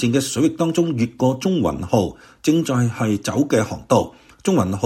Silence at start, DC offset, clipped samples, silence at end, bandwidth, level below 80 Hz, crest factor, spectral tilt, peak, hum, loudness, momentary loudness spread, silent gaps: 0 s; under 0.1%; under 0.1%; 0 s; 16.5 kHz; -48 dBFS; 18 dB; -6 dB/octave; -2 dBFS; none; -20 LUFS; 3 LU; none